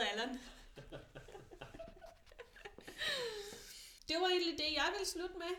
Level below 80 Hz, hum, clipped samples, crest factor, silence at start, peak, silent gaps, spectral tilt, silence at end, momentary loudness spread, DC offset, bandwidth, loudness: -62 dBFS; none; under 0.1%; 18 dB; 0 s; -24 dBFS; none; -2 dB/octave; 0 s; 22 LU; under 0.1%; 19 kHz; -38 LUFS